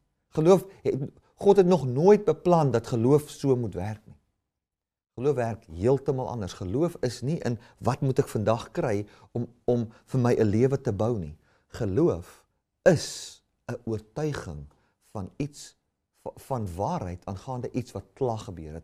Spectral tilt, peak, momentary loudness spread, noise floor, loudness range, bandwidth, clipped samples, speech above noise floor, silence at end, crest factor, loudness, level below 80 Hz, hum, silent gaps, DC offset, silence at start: -7 dB/octave; -6 dBFS; 18 LU; -90 dBFS; 12 LU; 15 kHz; under 0.1%; 64 dB; 0.05 s; 20 dB; -27 LUFS; -56 dBFS; none; none; under 0.1%; 0.35 s